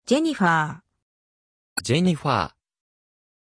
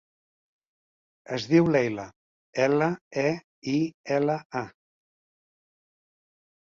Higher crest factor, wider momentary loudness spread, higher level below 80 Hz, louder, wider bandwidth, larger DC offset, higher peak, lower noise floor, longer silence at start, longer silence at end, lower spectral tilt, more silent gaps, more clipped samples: about the same, 18 dB vs 20 dB; about the same, 12 LU vs 13 LU; first, -58 dBFS vs -66 dBFS; first, -23 LUFS vs -26 LUFS; first, 11 kHz vs 7.4 kHz; neither; about the same, -6 dBFS vs -8 dBFS; about the same, under -90 dBFS vs under -90 dBFS; second, 0.1 s vs 1.3 s; second, 1.05 s vs 1.95 s; second, -5 dB/octave vs -6.5 dB/octave; second, 1.02-1.76 s vs 2.16-2.53 s, 3.01-3.11 s, 3.44-3.62 s, 3.94-4.04 s, 4.45-4.50 s; neither